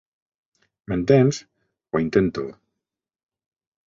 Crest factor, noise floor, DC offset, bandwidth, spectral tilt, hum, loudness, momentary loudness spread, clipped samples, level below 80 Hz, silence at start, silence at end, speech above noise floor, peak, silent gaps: 20 dB; -85 dBFS; under 0.1%; 7.6 kHz; -7 dB/octave; none; -21 LUFS; 15 LU; under 0.1%; -52 dBFS; 0.9 s; 1.35 s; 65 dB; -4 dBFS; none